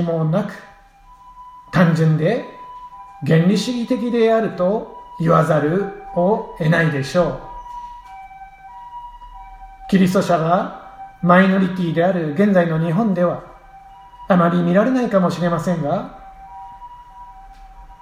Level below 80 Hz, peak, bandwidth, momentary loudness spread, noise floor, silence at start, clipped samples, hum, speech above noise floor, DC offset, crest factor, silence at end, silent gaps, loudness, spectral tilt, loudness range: -48 dBFS; 0 dBFS; 14.5 kHz; 23 LU; -46 dBFS; 0 s; under 0.1%; none; 30 dB; under 0.1%; 18 dB; 0.05 s; none; -18 LUFS; -7.5 dB/octave; 5 LU